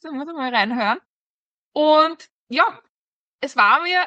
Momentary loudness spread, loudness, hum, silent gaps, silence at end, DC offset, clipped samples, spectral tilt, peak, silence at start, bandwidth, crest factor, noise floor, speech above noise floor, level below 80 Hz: 15 LU; -19 LUFS; none; 1.06-1.72 s, 2.31-2.47 s, 2.89-3.39 s; 0 s; under 0.1%; under 0.1%; -4 dB/octave; -4 dBFS; 0.05 s; 8.4 kHz; 18 dB; under -90 dBFS; over 71 dB; -78 dBFS